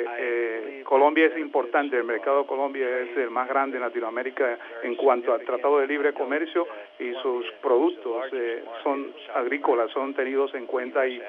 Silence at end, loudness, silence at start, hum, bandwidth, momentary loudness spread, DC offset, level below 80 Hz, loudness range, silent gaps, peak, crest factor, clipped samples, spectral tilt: 0 s; -25 LUFS; 0 s; none; 4.1 kHz; 8 LU; under 0.1%; -88 dBFS; 3 LU; none; -6 dBFS; 18 dB; under 0.1%; -5.5 dB/octave